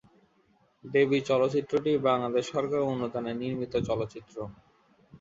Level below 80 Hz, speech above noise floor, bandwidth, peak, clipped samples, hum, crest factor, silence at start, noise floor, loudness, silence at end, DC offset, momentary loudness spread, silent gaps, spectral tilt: -60 dBFS; 39 dB; 7.8 kHz; -12 dBFS; under 0.1%; none; 18 dB; 0.85 s; -67 dBFS; -28 LUFS; 0.05 s; under 0.1%; 13 LU; none; -6.5 dB/octave